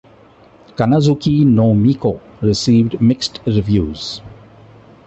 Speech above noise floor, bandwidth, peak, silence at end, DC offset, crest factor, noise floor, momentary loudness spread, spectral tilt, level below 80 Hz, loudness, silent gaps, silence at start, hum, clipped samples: 32 dB; 8.4 kHz; -2 dBFS; 0.75 s; under 0.1%; 14 dB; -45 dBFS; 12 LU; -7 dB/octave; -38 dBFS; -15 LUFS; none; 0.8 s; none; under 0.1%